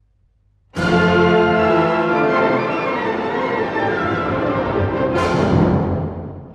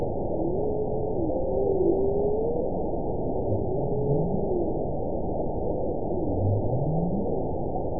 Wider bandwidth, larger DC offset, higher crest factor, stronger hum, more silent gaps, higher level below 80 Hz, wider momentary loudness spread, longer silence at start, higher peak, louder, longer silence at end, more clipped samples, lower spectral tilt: first, 10 kHz vs 1 kHz; second, under 0.1% vs 2%; about the same, 16 dB vs 16 dB; neither; neither; about the same, -40 dBFS vs -36 dBFS; about the same, 7 LU vs 5 LU; first, 0.75 s vs 0 s; first, -2 dBFS vs -10 dBFS; first, -17 LUFS vs -27 LUFS; about the same, 0 s vs 0 s; neither; second, -7.5 dB/octave vs -18.5 dB/octave